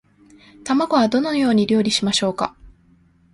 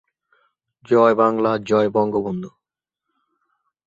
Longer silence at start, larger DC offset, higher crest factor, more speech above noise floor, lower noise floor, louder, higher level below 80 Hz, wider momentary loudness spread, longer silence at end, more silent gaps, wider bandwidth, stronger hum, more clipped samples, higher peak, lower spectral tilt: second, 0.65 s vs 0.9 s; neither; about the same, 16 dB vs 18 dB; second, 37 dB vs 67 dB; second, -55 dBFS vs -85 dBFS; about the same, -19 LUFS vs -18 LUFS; first, -54 dBFS vs -62 dBFS; second, 9 LU vs 13 LU; second, 0.65 s vs 1.4 s; neither; first, 11.5 kHz vs 7.8 kHz; neither; neither; about the same, -4 dBFS vs -2 dBFS; second, -4.5 dB/octave vs -7.5 dB/octave